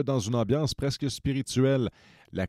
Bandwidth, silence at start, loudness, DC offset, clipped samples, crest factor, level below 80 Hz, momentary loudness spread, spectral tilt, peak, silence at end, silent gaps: 13.5 kHz; 0 s; -28 LUFS; under 0.1%; under 0.1%; 14 dB; -50 dBFS; 6 LU; -6 dB/octave; -12 dBFS; 0 s; none